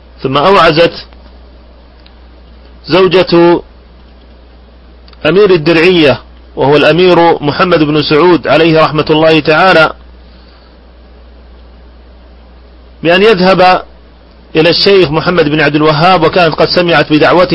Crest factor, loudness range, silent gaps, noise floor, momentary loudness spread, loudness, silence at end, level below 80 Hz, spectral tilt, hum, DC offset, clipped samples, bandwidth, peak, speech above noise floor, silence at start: 8 dB; 5 LU; none; -37 dBFS; 6 LU; -7 LUFS; 0 s; -36 dBFS; -7 dB/octave; none; under 0.1%; 0.7%; 11 kHz; 0 dBFS; 30 dB; 0.2 s